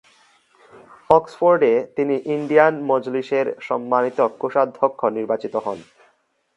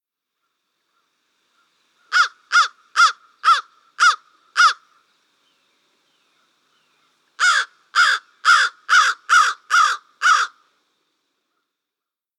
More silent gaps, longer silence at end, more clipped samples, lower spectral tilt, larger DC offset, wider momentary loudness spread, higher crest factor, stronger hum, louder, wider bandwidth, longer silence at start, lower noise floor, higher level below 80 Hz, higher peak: neither; second, 0.75 s vs 1.9 s; neither; first, -7 dB/octave vs 6.5 dB/octave; neither; first, 9 LU vs 6 LU; about the same, 20 dB vs 18 dB; neither; second, -20 LUFS vs -17 LUFS; second, 8.4 kHz vs 14 kHz; second, 1.1 s vs 2.1 s; second, -63 dBFS vs -86 dBFS; first, -62 dBFS vs under -90 dBFS; about the same, 0 dBFS vs -2 dBFS